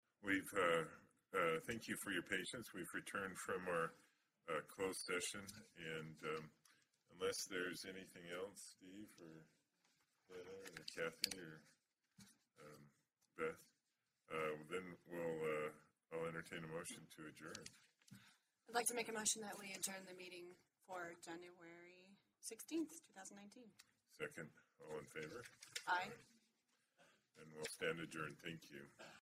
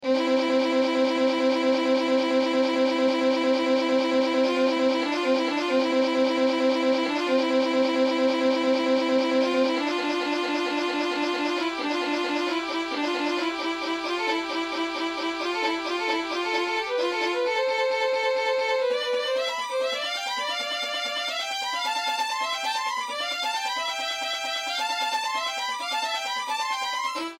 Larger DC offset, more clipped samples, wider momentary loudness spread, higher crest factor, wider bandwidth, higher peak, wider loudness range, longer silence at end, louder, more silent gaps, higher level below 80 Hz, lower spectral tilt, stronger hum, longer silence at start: neither; neither; first, 21 LU vs 5 LU; first, 32 dB vs 14 dB; about the same, 16 kHz vs 15.5 kHz; second, -18 dBFS vs -12 dBFS; first, 8 LU vs 4 LU; about the same, 0 s vs 0.05 s; second, -47 LUFS vs -25 LUFS; neither; second, -82 dBFS vs -70 dBFS; about the same, -2.5 dB/octave vs -2 dB/octave; neither; first, 0.2 s vs 0 s